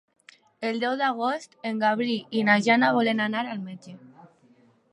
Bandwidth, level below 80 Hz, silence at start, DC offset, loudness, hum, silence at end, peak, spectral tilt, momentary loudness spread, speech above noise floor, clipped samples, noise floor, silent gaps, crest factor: 11 kHz; -78 dBFS; 0.6 s; under 0.1%; -24 LUFS; none; 0.65 s; -6 dBFS; -5 dB/octave; 13 LU; 35 dB; under 0.1%; -59 dBFS; none; 20 dB